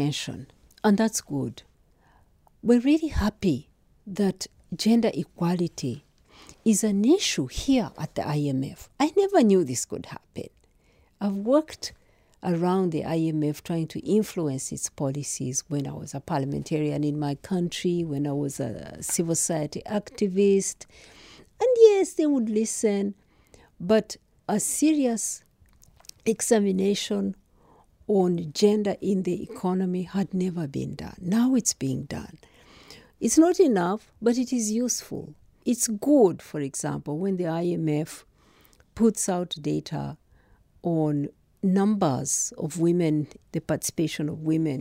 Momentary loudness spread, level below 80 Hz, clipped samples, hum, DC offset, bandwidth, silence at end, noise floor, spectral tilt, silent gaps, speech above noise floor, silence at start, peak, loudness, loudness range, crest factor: 13 LU; -52 dBFS; under 0.1%; none; under 0.1%; 16 kHz; 0 s; -61 dBFS; -5 dB/octave; none; 37 dB; 0 s; -4 dBFS; -25 LUFS; 5 LU; 22 dB